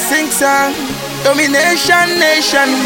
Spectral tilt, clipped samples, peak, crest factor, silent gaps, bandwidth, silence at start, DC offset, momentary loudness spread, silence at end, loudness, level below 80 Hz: -2 dB/octave; under 0.1%; 0 dBFS; 12 dB; none; 17 kHz; 0 s; under 0.1%; 7 LU; 0 s; -11 LUFS; -46 dBFS